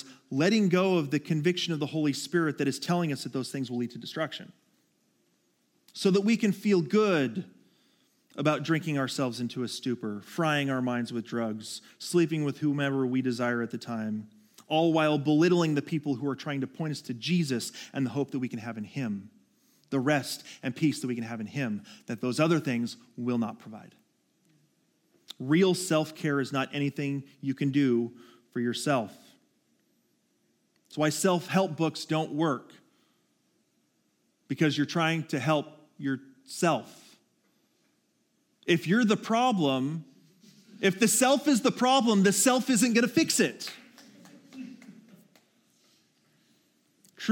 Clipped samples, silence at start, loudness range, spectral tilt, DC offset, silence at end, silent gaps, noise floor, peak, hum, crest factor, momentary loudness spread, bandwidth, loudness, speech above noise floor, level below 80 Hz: under 0.1%; 0 s; 7 LU; -5 dB/octave; under 0.1%; 0 s; none; -72 dBFS; -8 dBFS; none; 20 dB; 13 LU; 17 kHz; -28 LUFS; 45 dB; -82 dBFS